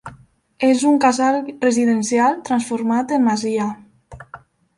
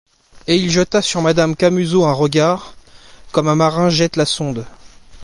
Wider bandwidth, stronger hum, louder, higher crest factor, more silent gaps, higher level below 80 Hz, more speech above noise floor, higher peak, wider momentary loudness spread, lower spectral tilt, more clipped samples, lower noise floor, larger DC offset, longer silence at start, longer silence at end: about the same, 11.5 kHz vs 11.5 kHz; neither; second, -18 LUFS vs -15 LUFS; about the same, 14 dB vs 14 dB; neither; second, -58 dBFS vs -46 dBFS; first, 31 dB vs 26 dB; about the same, -4 dBFS vs -2 dBFS; first, 10 LU vs 7 LU; about the same, -4.5 dB/octave vs -5 dB/octave; neither; first, -48 dBFS vs -41 dBFS; neither; second, 0.05 s vs 0.5 s; first, 0.4 s vs 0 s